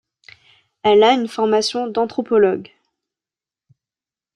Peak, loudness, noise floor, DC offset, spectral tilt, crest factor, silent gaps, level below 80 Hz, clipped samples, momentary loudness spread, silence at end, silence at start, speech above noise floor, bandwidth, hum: -2 dBFS; -17 LUFS; under -90 dBFS; under 0.1%; -4 dB/octave; 16 dB; none; -66 dBFS; under 0.1%; 9 LU; 1.7 s; 0.85 s; over 74 dB; 11 kHz; none